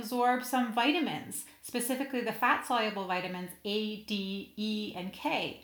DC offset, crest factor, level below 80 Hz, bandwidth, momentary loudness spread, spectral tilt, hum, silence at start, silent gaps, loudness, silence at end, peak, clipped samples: under 0.1%; 20 dB; -72 dBFS; over 20 kHz; 10 LU; -3.5 dB/octave; none; 0 s; none; -32 LUFS; 0 s; -12 dBFS; under 0.1%